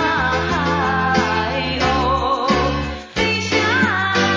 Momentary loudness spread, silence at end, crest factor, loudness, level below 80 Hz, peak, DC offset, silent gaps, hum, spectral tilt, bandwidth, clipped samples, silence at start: 4 LU; 0 s; 14 dB; -18 LUFS; -32 dBFS; -4 dBFS; under 0.1%; none; none; -4.5 dB/octave; 7.8 kHz; under 0.1%; 0 s